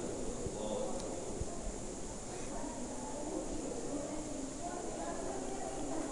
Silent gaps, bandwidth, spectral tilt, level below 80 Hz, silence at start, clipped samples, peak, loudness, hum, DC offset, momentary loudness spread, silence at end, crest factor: none; 11 kHz; -4.5 dB/octave; -50 dBFS; 0 s; under 0.1%; -24 dBFS; -41 LUFS; none; under 0.1%; 4 LU; 0 s; 16 dB